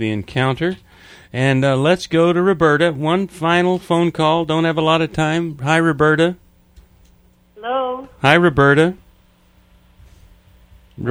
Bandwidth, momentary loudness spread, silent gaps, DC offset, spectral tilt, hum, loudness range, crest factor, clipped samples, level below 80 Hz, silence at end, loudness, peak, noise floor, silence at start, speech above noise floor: 12.5 kHz; 9 LU; none; under 0.1%; -6.5 dB/octave; none; 2 LU; 18 dB; under 0.1%; -46 dBFS; 0 s; -16 LUFS; 0 dBFS; -53 dBFS; 0 s; 37 dB